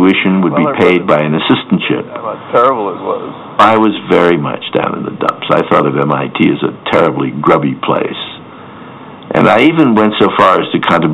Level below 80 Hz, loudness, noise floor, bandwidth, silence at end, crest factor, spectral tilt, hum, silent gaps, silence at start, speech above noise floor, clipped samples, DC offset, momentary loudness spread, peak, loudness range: -50 dBFS; -11 LUFS; -31 dBFS; 9.6 kHz; 0 s; 12 dB; -7.5 dB/octave; none; none; 0 s; 20 dB; under 0.1%; under 0.1%; 12 LU; 0 dBFS; 2 LU